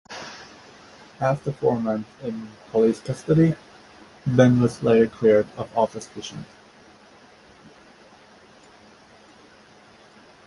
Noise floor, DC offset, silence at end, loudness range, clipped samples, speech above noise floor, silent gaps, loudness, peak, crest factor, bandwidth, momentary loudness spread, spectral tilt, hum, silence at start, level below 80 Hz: -51 dBFS; under 0.1%; 4 s; 12 LU; under 0.1%; 30 dB; none; -22 LUFS; -2 dBFS; 22 dB; 11.5 kHz; 19 LU; -7.5 dB/octave; none; 0.1 s; -56 dBFS